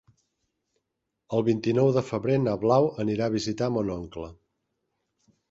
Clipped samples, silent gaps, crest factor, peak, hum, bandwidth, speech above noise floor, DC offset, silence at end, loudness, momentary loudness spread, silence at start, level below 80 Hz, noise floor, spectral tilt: under 0.1%; none; 20 dB; -8 dBFS; none; 8 kHz; 57 dB; under 0.1%; 1.15 s; -26 LUFS; 12 LU; 1.3 s; -56 dBFS; -82 dBFS; -7 dB/octave